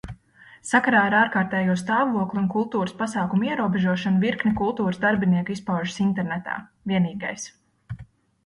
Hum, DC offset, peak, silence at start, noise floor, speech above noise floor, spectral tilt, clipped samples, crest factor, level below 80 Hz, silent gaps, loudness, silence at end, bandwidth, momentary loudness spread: none; under 0.1%; -6 dBFS; 0.05 s; -51 dBFS; 29 dB; -6 dB/octave; under 0.1%; 18 dB; -54 dBFS; none; -23 LUFS; 0.4 s; 11.5 kHz; 15 LU